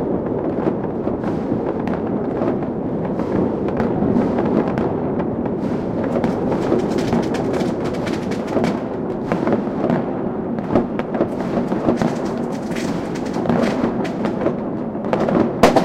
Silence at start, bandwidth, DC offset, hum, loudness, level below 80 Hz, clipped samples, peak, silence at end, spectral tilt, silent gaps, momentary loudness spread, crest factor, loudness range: 0 s; 14.5 kHz; under 0.1%; none; -20 LUFS; -42 dBFS; under 0.1%; 0 dBFS; 0 s; -7.5 dB/octave; none; 5 LU; 18 dB; 2 LU